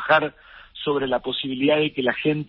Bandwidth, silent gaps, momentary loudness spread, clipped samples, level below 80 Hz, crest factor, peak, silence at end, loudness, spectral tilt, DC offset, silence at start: 5.8 kHz; none; 10 LU; under 0.1%; -56 dBFS; 18 dB; -4 dBFS; 0 s; -23 LUFS; -10 dB/octave; under 0.1%; 0 s